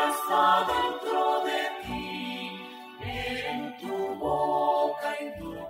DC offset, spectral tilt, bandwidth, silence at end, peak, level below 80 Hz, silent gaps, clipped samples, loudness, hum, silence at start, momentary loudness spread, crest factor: under 0.1%; -4 dB/octave; 16 kHz; 0 s; -10 dBFS; -54 dBFS; none; under 0.1%; -28 LUFS; none; 0 s; 13 LU; 18 dB